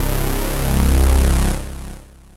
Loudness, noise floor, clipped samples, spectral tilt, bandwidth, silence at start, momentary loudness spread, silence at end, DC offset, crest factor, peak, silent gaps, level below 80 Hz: -18 LUFS; -36 dBFS; under 0.1%; -5.5 dB/octave; 16 kHz; 0 s; 17 LU; 0.35 s; under 0.1%; 14 dB; -2 dBFS; none; -18 dBFS